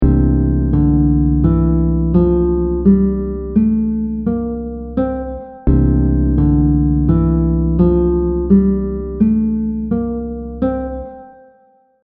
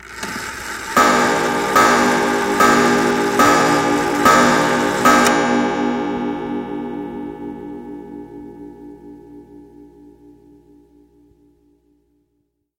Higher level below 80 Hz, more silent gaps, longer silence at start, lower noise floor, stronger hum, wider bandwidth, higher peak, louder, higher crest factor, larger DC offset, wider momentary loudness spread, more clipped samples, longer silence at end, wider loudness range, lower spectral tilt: first, -20 dBFS vs -48 dBFS; neither; about the same, 0 s vs 0 s; second, -53 dBFS vs -69 dBFS; neither; second, 2.6 kHz vs 16.5 kHz; about the same, 0 dBFS vs 0 dBFS; about the same, -15 LUFS vs -15 LUFS; about the same, 14 dB vs 18 dB; neither; second, 9 LU vs 20 LU; neither; second, 0.75 s vs 2.95 s; second, 4 LU vs 19 LU; first, -12.5 dB/octave vs -3.5 dB/octave